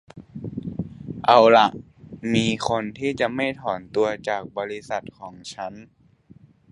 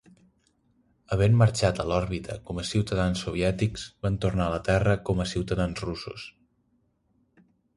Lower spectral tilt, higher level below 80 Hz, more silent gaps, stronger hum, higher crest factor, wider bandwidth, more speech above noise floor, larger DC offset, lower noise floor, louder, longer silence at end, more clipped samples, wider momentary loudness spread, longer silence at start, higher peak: about the same, -5 dB/octave vs -6 dB/octave; second, -54 dBFS vs -42 dBFS; neither; neither; about the same, 22 dB vs 20 dB; about the same, 11 kHz vs 11.5 kHz; second, 30 dB vs 44 dB; neither; second, -52 dBFS vs -70 dBFS; first, -22 LUFS vs -27 LUFS; second, 0.9 s vs 1.45 s; neither; first, 21 LU vs 12 LU; second, 0.15 s vs 1.1 s; first, 0 dBFS vs -8 dBFS